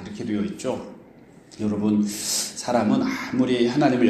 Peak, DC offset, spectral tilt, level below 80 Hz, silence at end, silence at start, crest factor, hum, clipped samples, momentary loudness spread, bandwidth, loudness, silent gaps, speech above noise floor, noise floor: -4 dBFS; under 0.1%; -4.5 dB/octave; -60 dBFS; 0 s; 0 s; 20 dB; none; under 0.1%; 9 LU; 15.5 kHz; -24 LUFS; none; 27 dB; -49 dBFS